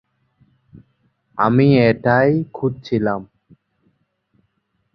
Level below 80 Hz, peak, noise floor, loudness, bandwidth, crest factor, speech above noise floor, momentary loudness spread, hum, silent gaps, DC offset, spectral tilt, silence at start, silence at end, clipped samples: -54 dBFS; -2 dBFS; -68 dBFS; -17 LUFS; 6 kHz; 18 dB; 52 dB; 11 LU; none; none; under 0.1%; -9.5 dB/octave; 1.35 s; 1.7 s; under 0.1%